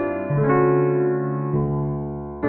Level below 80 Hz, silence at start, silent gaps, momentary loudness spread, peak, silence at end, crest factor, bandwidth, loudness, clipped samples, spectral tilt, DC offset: -44 dBFS; 0 s; none; 9 LU; -8 dBFS; 0 s; 14 dB; 3 kHz; -21 LUFS; under 0.1%; -14 dB/octave; under 0.1%